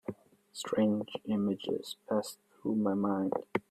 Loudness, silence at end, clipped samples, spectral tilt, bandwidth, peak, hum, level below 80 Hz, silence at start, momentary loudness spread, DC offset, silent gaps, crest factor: -33 LUFS; 0.1 s; under 0.1%; -6 dB/octave; 13.5 kHz; -16 dBFS; none; -74 dBFS; 0.1 s; 12 LU; under 0.1%; none; 18 dB